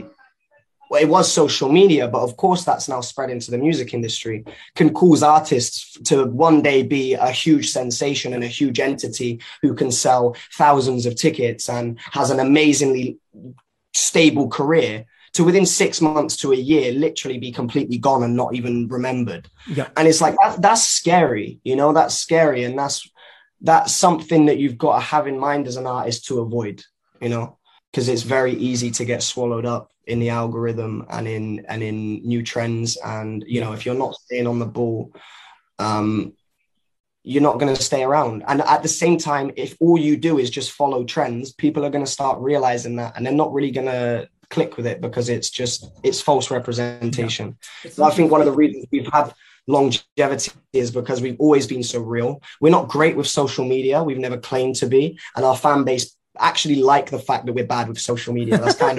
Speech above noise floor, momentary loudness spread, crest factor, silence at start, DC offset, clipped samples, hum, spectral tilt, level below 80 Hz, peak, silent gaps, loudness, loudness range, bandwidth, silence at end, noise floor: 55 dB; 11 LU; 18 dB; 0 s; under 0.1%; under 0.1%; none; -4.5 dB/octave; -58 dBFS; -2 dBFS; 27.88-27.93 s, 37.00-37.04 s, 50.12-50.16 s; -19 LUFS; 7 LU; 12.5 kHz; 0 s; -74 dBFS